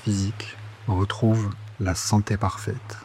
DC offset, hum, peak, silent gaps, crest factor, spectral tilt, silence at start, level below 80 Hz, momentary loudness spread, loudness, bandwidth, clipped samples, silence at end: under 0.1%; none; -8 dBFS; none; 16 dB; -5.5 dB/octave; 0 s; -50 dBFS; 11 LU; -25 LUFS; 14 kHz; under 0.1%; 0 s